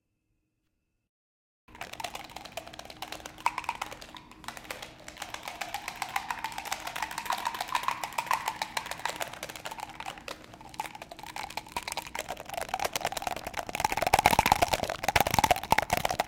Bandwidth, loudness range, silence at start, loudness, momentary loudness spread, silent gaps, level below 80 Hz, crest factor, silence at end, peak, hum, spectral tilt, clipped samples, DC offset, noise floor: 17 kHz; 11 LU; 1.7 s; -32 LUFS; 17 LU; none; -52 dBFS; 30 dB; 0 s; -2 dBFS; none; -2.5 dB/octave; under 0.1%; under 0.1%; -79 dBFS